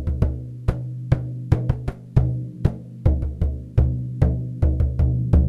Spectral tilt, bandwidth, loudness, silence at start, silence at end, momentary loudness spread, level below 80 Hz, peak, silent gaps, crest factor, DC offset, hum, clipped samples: -10 dB/octave; 5.4 kHz; -23 LUFS; 0 s; 0 s; 6 LU; -24 dBFS; -6 dBFS; none; 16 dB; under 0.1%; none; under 0.1%